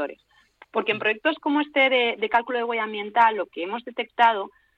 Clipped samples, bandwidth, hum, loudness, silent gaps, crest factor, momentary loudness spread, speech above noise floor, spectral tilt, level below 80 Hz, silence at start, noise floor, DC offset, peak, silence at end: under 0.1%; 7 kHz; none; -23 LUFS; none; 16 dB; 11 LU; 32 dB; -5 dB/octave; -72 dBFS; 0 s; -55 dBFS; under 0.1%; -8 dBFS; 0.3 s